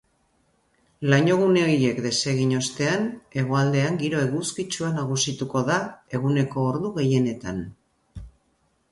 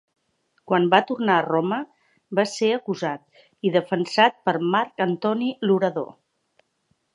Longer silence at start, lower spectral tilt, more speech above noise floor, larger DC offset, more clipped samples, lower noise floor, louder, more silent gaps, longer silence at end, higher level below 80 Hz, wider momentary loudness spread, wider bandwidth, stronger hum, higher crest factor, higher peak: first, 1 s vs 0.7 s; about the same, -5 dB/octave vs -5.5 dB/octave; about the same, 45 dB vs 48 dB; neither; neither; about the same, -68 dBFS vs -70 dBFS; about the same, -23 LUFS vs -22 LUFS; neither; second, 0.65 s vs 1.1 s; first, -54 dBFS vs -76 dBFS; about the same, 11 LU vs 10 LU; about the same, 11.5 kHz vs 11 kHz; neither; second, 16 dB vs 22 dB; second, -8 dBFS vs -2 dBFS